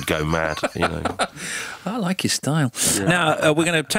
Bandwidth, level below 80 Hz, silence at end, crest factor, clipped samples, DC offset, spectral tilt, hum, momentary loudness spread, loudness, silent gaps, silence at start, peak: 16.5 kHz; -44 dBFS; 0 s; 16 dB; under 0.1%; under 0.1%; -3.5 dB/octave; none; 9 LU; -21 LUFS; none; 0 s; -6 dBFS